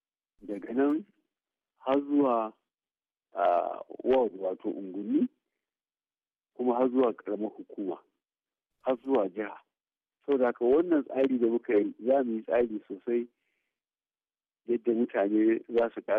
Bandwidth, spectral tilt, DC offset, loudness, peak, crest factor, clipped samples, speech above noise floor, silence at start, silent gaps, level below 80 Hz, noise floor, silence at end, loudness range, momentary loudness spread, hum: 4.2 kHz; -5 dB/octave; under 0.1%; -29 LUFS; -16 dBFS; 14 dB; under 0.1%; over 62 dB; 0.45 s; none; -72 dBFS; under -90 dBFS; 0 s; 5 LU; 12 LU; none